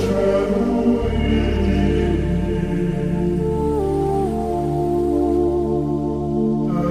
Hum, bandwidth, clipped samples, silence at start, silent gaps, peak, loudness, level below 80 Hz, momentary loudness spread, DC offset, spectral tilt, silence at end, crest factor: none; 14 kHz; under 0.1%; 0 s; none; -6 dBFS; -20 LUFS; -28 dBFS; 3 LU; 0.6%; -8.5 dB/octave; 0 s; 14 dB